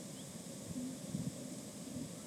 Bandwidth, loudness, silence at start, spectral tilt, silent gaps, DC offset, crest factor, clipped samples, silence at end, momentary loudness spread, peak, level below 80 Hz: 18 kHz; -45 LUFS; 0 s; -5 dB/octave; none; under 0.1%; 18 dB; under 0.1%; 0 s; 5 LU; -28 dBFS; -70 dBFS